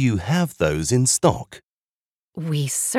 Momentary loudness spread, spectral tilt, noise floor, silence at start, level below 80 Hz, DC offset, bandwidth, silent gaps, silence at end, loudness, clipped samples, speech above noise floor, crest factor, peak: 15 LU; -4.5 dB/octave; under -90 dBFS; 0 s; -44 dBFS; under 0.1%; 16.5 kHz; 1.63-2.28 s; 0 s; -20 LUFS; under 0.1%; over 69 dB; 18 dB; -4 dBFS